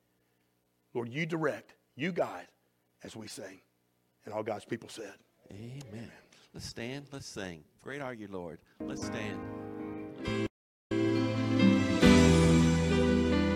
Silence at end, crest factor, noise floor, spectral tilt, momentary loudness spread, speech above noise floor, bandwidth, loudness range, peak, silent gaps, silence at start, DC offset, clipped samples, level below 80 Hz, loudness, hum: 0 s; 22 dB; -75 dBFS; -6 dB/octave; 22 LU; 36 dB; 14 kHz; 17 LU; -10 dBFS; 10.50-10.90 s; 0.95 s; under 0.1%; under 0.1%; -46 dBFS; -30 LUFS; 60 Hz at -70 dBFS